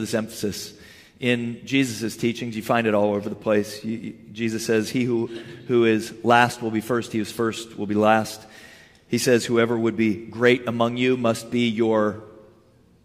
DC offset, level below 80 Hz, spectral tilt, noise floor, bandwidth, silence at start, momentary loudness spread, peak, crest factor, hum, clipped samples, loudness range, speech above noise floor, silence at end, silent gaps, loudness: under 0.1%; -64 dBFS; -5 dB/octave; -56 dBFS; 15.5 kHz; 0 s; 11 LU; -4 dBFS; 20 dB; none; under 0.1%; 3 LU; 33 dB; 0.65 s; none; -23 LUFS